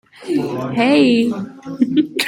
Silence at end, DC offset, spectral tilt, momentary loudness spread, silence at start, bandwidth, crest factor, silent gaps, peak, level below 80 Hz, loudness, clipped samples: 0 s; under 0.1%; -5.5 dB/octave; 11 LU; 0.2 s; 16.5 kHz; 14 dB; none; -2 dBFS; -60 dBFS; -16 LUFS; under 0.1%